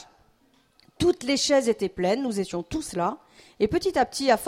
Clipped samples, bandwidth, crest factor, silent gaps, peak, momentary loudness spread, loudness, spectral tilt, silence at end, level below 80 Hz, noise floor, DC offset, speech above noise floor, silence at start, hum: under 0.1%; 16 kHz; 18 dB; none; -8 dBFS; 8 LU; -25 LUFS; -4 dB/octave; 0 s; -52 dBFS; -63 dBFS; under 0.1%; 38 dB; 0 s; none